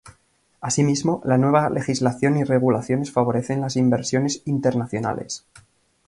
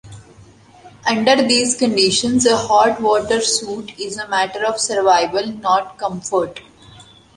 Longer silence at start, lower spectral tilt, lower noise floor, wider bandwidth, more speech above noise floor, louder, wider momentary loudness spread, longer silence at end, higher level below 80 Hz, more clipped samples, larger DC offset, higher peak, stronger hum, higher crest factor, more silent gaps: about the same, 0.05 s vs 0.05 s; first, -6 dB/octave vs -2.5 dB/octave; first, -62 dBFS vs -45 dBFS; about the same, 11.5 kHz vs 11.5 kHz; first, 42 dB vs 28 dB; second, -21 LUFS vs -16 LUFS; second, 7 LU vs 12 LU; first, 0.7 s vs 0.35 s; about the same, -56 dBFS vs -52 dBFS; neither; neither; second, -4 dBFS vs 0 dBFS; neither; about the same, 18 dB vs 18 dB; neither